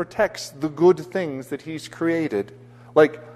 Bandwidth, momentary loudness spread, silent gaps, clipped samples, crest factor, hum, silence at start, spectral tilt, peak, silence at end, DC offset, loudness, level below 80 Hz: 13.5 kHz; 13 LU; none; under 0.1%; 20 dB; none; 0 s; -6 dB/octave; -2 dBFS; 0.05 s; under 0.1%; -22 LUFS; -60 dBFS